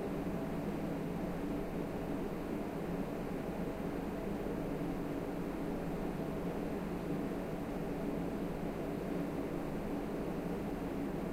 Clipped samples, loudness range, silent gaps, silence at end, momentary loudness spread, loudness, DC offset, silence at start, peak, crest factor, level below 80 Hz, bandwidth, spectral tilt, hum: under 0.1%; 0 LU; none; 0 s; 1 LU; -40 LUFS; under 0.1%; 0 s; -26 dBFS; 12 dB; -50 dBFS; 16 kHz; -7.5 dB/octave; none